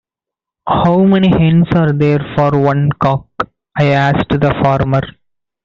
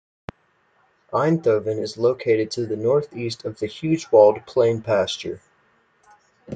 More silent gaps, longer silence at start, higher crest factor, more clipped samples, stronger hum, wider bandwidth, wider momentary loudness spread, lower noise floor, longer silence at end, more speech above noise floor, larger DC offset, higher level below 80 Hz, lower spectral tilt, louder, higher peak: neither; second, 0.65 s vs 1.1 s; second, 12 dB vs 20 dB; neither; neither; second, 6.8 kHz vs 9.2 kHz; second, 10 LU vs 15 LU; first, -85 dBFS vs -63 dBFS; first, 0.55 s vs 0 s; first, 73 dB vs 43 dB; neither; first, -38 dBFS vs -62 dBFS; first, -9 dB/octave vs -6 dB/octave; first, -13 LUFS vs -21 LUFS; about the same, -2 dBFS vs -2 dBFS